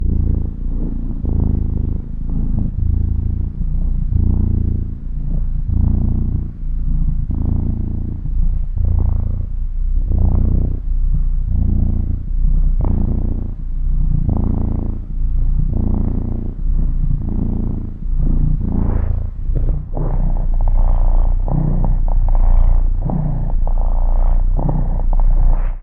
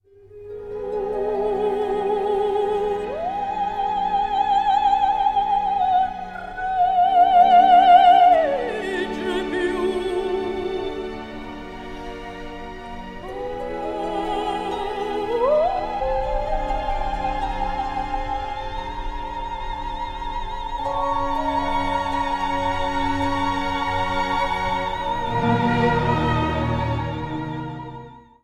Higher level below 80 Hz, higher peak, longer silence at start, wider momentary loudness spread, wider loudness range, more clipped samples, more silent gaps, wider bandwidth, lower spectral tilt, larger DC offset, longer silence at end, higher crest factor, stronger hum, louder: first, -16 dBFS vs -36 dBFS; about the same, -2 dBFS vs -2 dBFS; second, 0 s vs 0.25 s; second, 6 LU vs 15 LU; second, 2 LU vs 13 LU; neither; neither; second, 1.8 kHz vs 10.5 kHz; first, -13 dB/octave vs -6.5 dB/octave; neither; second, 0 s vs 0.25 s; second, 12 dB vs 18 dB; neither; about the same, -21 LUFS vs -21 LUFS